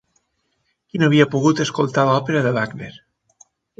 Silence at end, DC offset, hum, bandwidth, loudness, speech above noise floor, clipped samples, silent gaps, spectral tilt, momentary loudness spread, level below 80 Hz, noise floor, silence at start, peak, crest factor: 0.9 s; under 0.1%; none; 7.8 kHz; -18 LUFS; 52 dB; under 0.1%; none; -6 dB/octave; 15 LU; -58 dBFS; -70 dBFS; 0.95 s; 0 dBFS; 20 dB